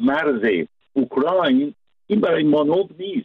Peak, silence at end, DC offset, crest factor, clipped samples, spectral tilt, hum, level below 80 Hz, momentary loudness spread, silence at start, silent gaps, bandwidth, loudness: -8 dBFS; 0 s; under 0.1%; 12 dB; under 0.1%; -8.5 dB/octave; none; -62 dBFS; 8 LU; 0 s; none; 4.7 kHz; -20 LUFS